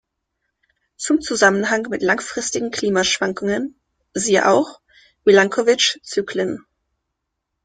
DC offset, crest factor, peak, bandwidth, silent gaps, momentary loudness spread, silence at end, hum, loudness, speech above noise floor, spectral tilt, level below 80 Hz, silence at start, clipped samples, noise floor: under 0.1%; 20 dB; 0 dBFS; 9.6 kHz; none; 11 LU; 1.05 s; none; -18 LUFS; 60 dB; -3 dB/octave; -58 dBFS; 1 s; under 0.1%; -78 dBFS